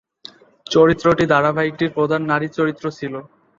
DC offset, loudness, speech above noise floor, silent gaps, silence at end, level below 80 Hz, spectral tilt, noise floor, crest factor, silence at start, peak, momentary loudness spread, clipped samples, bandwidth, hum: under 0.1%; -18 LUFS; 26 dB; none; 0.35 s; -50 dBFS; -6.5 dB/octave; -44 dBFS; 16 dB; 0.7 s; -2 dBFS; 13 LU; under 0.1%; 7.4 kHz; none